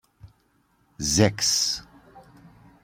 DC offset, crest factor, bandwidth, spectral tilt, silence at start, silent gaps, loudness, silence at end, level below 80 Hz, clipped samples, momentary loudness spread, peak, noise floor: under 0.1%; 24 dB; 16.5 kHz; -3 dB/octave; 0.25 s; none; -22 LUFS; 0.65 s; -50 dBFS; under 0.1%; 10 LU; -4 dBFS; -66 dBFS